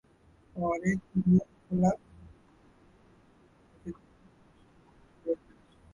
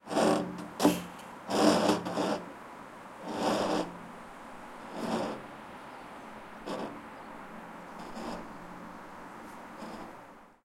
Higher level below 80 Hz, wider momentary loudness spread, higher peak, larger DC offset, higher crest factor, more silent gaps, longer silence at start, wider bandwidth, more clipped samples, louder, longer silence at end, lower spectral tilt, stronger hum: first, -58 dBFS vs -64 dBFS; about the same, 20 LU vs 19 LU; second, -14 dBFS vs -10 dBFS; neither; about the same, 20 dB vs 24 dB; neither; first, 0.55 s vs 0.05 s; second, 7.4 kHz vs 16.5 kHz; neither; about the same, -30 LUFS vs -32 LUFS; first, 0.6 s vs 0.1 s; first, -9 dB/octave vs -4.5 dB/octave; neither